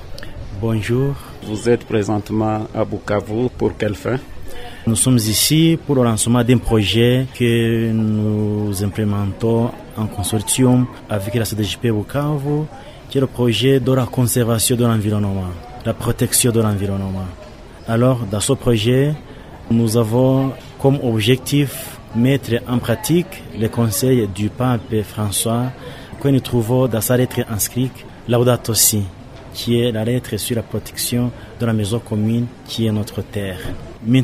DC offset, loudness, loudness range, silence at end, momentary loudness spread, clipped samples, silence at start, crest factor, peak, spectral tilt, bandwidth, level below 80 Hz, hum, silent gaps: under 0.1%; -18 LUFS; 4 LU; 0 s; 12 LU; under 0.1%; 0 s; 16 dB; 0 dBFS; -5 dB/octave; 16 kHz; -38 dBFS; none; none